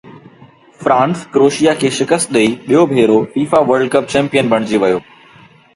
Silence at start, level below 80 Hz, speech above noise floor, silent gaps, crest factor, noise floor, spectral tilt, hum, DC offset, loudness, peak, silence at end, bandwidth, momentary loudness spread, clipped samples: 0.05 s; -54 dBFS; 31 dB; none; 14 dB; -44 dBFS; -5 dB/octave; none; under 0.1%; -13 LUFS; 0 dBFS; 0.75 s; 11.5 kHz; 4 LU; under 0.1%